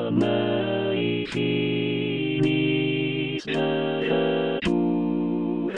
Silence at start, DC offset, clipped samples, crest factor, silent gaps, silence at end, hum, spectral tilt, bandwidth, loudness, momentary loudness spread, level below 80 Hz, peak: 0 s; 0.3%; under 0.1%; 16 dB; none; 0 s; none; -7 dB/octave; 9.2 kHz; -24 LUFS; 3 LU; -56 dBFS; -8 dBFS